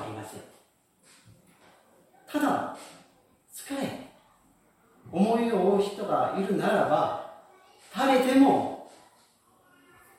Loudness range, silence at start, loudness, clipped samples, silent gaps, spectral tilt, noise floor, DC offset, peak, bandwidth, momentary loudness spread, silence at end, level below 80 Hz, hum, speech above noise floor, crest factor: 10 LU; 0 s; -26 LUFS; under 0.1%; none; -6 dB/octave; -64 dBFS; under 0.1%; -8 dBFS; 16.5 kHz; 22 LU; 1.3 s; -72 dBFS; none; 40 dB; 20 dB